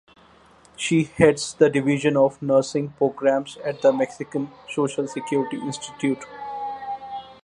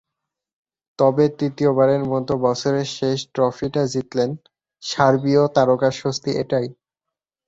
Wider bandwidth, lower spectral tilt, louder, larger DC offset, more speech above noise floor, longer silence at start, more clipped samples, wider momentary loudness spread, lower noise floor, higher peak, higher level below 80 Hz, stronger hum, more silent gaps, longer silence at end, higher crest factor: first, 11 kHz vs 8 kHz; about the same, -5.5 dB/octave vs -6 dB/octave; second, -23 LUFS vs -20 LUFS; neither; second, 31 dB vs 67 dB; second, 0.8 s vs 1 s; neither; first, 13 LU vs 7 LU; second, -53 dBFS vs -86 dBFS; about the same, -2 dBFS vs -2 dBFS; about the same, -58 dBFS vs -58 dBFS; neither; neither; second, 0.1 s vs 0.75 s; about the same, 22 dB vs 18 dB